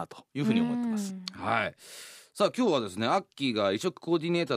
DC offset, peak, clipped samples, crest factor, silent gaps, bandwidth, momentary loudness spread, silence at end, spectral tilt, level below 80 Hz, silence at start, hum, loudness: under 0.1%; -10 dBFS; under 0.1%; 20 dB; none; 15.5 kHz; 12 LU; 0 s; -5.5 dB/octave; -74 dBFS; 0 s; none; -29 LUFS